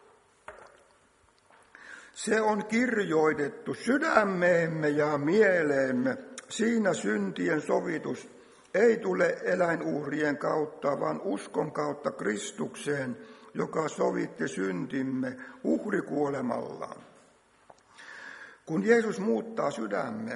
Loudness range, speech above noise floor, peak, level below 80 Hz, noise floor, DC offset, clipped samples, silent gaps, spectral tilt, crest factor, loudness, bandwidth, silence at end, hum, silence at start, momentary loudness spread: 7 LU; 36 dB; -6 dBFS; -72 dBFS; -64 dBFS; under 0.1%; under 0.1%; none; -5.5 dB/octave; 24 dB; -29 LUFS; 11.5 kHz; 0 s; none; 0.5 s; 14 LU